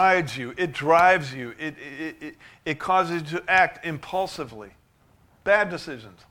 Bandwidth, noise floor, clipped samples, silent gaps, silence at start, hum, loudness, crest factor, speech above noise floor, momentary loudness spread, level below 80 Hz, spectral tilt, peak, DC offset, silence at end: 16.5 kHz; -60 dBFS; under 0.1%; none; 0 s; none; -23 LUFS; 20 dB; 35 dB; 18 LU; -58 dBFS; -5 dB/octave; -4 dBFS; under 0.1%; 0.2 s